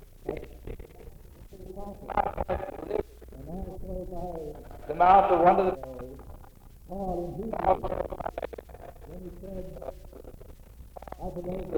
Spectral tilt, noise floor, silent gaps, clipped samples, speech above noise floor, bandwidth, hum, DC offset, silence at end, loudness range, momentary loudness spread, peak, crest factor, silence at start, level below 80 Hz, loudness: -7.5 dB/octave; -49 dBFS; none; under 0.1%; 23 dB; over 20 kHz; none; under 0.1%; 0 s; 14 LU; 26 LU; -8 dBFS; 24 dB; 0 s; -44 dBFS; -28 LUFS